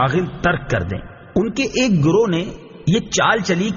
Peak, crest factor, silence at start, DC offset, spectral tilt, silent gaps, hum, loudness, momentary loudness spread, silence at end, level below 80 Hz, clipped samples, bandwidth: -4 dBFS; 16 dB; 0 s; under 0.1%; -5 dB/octave; none; none; -18 LUFS; 9 LU; 0 s; -40 dBFS; under 0.1%; 7.4 kHz